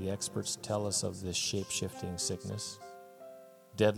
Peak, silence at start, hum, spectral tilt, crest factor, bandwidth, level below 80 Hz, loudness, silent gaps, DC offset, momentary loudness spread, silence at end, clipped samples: -14 dBFS; 0 s; none; -3.5 dB/octave; 22 dB; 18.5 kHz; -64 dBFS; -35 LUFS; none; under 0.1%; 19 LU; 0 s; under 0.1%